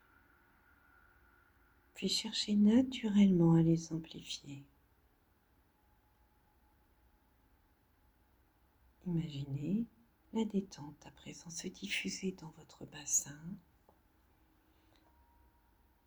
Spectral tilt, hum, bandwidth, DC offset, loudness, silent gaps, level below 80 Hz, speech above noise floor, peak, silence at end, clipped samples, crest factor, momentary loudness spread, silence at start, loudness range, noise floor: -5 dB/octave; none; over 20 kHz; under 0.1%; -34 LUFS; none; -68 dBFS; 38 dB; -18 dBFS; 2.5 s; under 0.1%; 20 dB; 24 LU; 1.95 s; 14 LU; -72 dBFS